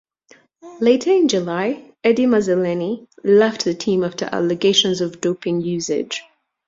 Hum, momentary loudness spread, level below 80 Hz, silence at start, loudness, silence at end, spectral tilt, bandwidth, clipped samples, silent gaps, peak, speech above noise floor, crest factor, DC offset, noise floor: none; 9 LU; -62 dBFS; 0.65 s; -18 LUFS; 0.45 s; -4.5 dB/octave; 7.8 kHz; under 0.1%; none; -2 dBFS; 35 dB; 16 dB; under 0.1%; -53 dBFS